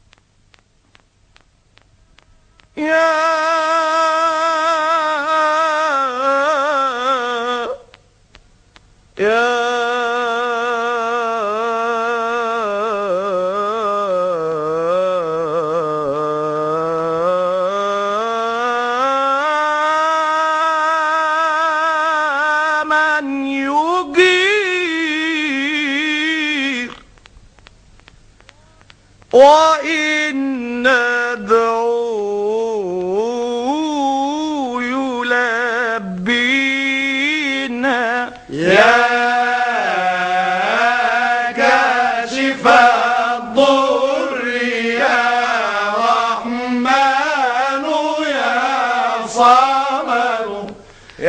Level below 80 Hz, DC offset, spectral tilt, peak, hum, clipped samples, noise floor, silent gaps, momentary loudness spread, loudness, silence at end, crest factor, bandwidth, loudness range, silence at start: -56 dBFS; under 0.1%; -3.5 dB/octave; 0 dBFS; none; under 0.1%; -54 dBFS; none; 7 LU; -16 LUFS; 0 s; 16 dB; 10 kHz; 5 LU; 2.75 s